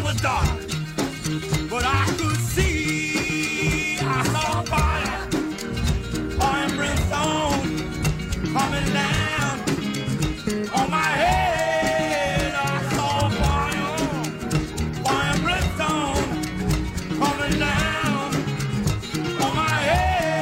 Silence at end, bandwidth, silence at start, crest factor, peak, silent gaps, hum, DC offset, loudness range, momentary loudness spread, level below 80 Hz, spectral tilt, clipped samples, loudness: 0 s; 16.5 kHz; 0 s; 14 dB; -8 dBFS; none; none; under 0.1%; 2 LU; 5 LU; -34 dBFS; -4.5 dB/octave; under 0.1%; -23 LUFS